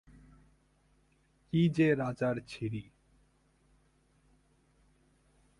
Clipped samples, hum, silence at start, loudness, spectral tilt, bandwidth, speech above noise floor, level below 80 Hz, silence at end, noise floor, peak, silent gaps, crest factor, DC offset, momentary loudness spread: under 0.1%; none; 1.55 s; -32 LUFS; -8 dB/octave; 11.5 kHz; 39 dB; -64 dBFS; 2.75 s; -70 dBFS; -16 dBFS; none; 20 dB; under 0.1%; 12 LU